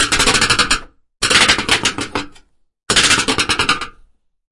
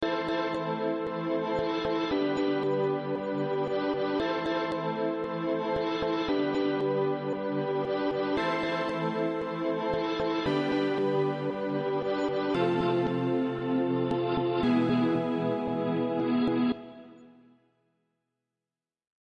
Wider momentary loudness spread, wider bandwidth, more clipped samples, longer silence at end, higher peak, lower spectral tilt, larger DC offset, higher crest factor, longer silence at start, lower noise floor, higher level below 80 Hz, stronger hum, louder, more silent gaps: first, 13 LU vs 4 LU; first, 12 kHz vs 7.6 kHz; neither; second, 0.6 s vs 1.95 s; first, 0 dBFS vs -14 dBFS; second, -1 dB/octave vs -7.5 dB/octave; neither; about the same, 16 dB vs 14 dB; about the same, 0 s vs 0 s; second, -50 dBFS vs under -90 dBFS; first, -36 dBFS vs -60 dBFS; neither; first, -13 LUFS vs -29 LUFS; neither